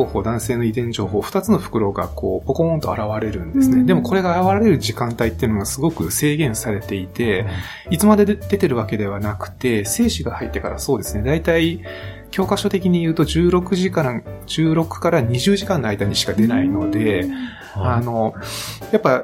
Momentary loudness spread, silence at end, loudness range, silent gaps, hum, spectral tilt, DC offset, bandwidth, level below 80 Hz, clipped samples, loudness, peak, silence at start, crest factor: 9 LU; 0 s; 3 LU; none; none; -5.5 dB/octave; under 0.1%; 17 kHz; -38 dBFS; under 0.1%; -19 LUFS; -2 dBFS; 0 s; 16 dB